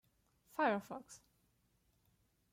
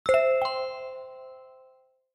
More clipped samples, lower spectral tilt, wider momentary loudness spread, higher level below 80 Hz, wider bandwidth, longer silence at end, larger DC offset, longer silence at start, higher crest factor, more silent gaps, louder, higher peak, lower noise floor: neither; first, -5 dB/octave vs -2.5 dB/octave; about the same, 22 LU vs 23 LU; second, -82 dBFS vs -64 dBFS; first, 16.5 kHz vs 11.5 kHz; first, 1.35 s vs 0.65 s; neither; first, 0.6 s vs 0.05 s; about the same, 20 dB vs 18 dB; neither; second, -39 LUFS vs -26 LUFS; second, -24 dBFS vs -12 dBFS; first, -77 dBFS vs -61 dBFS